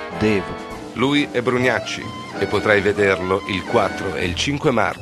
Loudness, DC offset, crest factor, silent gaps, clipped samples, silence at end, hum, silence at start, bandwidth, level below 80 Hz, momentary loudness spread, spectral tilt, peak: -19 LUFS; under 0.1%; 20 dB; none; under 0.1%; 0 s; none; 0 s; 13 kHz; -46 dBFS; 11 LU; -5 dB/octave; 0 dBFS